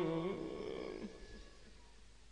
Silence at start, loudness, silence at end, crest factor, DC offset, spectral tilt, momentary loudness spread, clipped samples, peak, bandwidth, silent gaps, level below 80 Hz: 0 s; -44 LUFS; 0 s; 18 dB; under 0.1%; -6.5 dB/octave; 22 LU; under 0.1%; -26 dBFS; 10.5 kHz; none; -62 dBFS